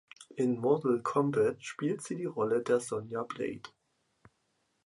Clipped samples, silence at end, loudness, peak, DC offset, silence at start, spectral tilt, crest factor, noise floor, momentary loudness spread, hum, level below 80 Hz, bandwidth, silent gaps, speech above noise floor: under 0.1%; 1.15 s; -32 LUFS; -14 dBFS; under 0.1%; 0.2 s; -6 dB/octave; 18 dB; -77 dBFS; 10 LU; none; -74 dBFS; 11.5 kHz; none; 46 dB